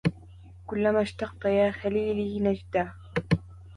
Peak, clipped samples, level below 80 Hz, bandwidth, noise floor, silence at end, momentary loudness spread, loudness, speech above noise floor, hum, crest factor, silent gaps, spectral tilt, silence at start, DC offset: -10 dBFS; under 0.1%; -48 dBFS; 10.5 kHz; -48 dBFS; 0 s; 7 LU; -28 LUFS; 21 dB; none; 16 dB; none; -8 dB/octave; 0.05 s; under 0.1%